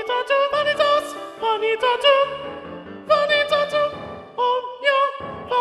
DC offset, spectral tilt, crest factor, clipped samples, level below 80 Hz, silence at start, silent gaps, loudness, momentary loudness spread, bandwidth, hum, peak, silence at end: under 0.1%; -3 dB/octave; 18 dB; under 0.1%; -58 dBFS; 0 s; none; -20 LUFS; 16 LU; 12.5 kHz; none; -4 dBFS; 0 s